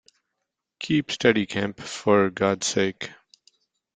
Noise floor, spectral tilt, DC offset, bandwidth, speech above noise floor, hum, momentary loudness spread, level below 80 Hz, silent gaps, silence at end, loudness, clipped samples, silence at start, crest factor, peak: -82 dBFS; -4.5 dB/octave; under 0.1%; 9.4 kHz; 59 dB; none; 13 LU; -62 dBFS; none; 0.85 s; -23 LUFS; under 0.1%; 0.8 s; 22 dB; -4 dBFS